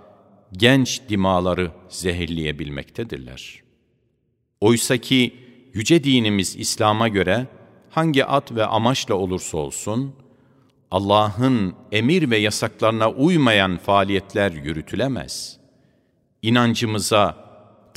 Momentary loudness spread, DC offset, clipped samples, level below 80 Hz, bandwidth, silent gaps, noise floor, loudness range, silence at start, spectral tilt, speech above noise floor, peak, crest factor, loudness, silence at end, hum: 13 LU; under 0.1%; under 0.1%; -50 dBFS; 16 kHz; none; -69 dBFS; 5 LU; 0.5 s; -4.5 dB/octave; 49 dB; 0 dBFS; 20 dB; -20 LUFS; 0.6 s; none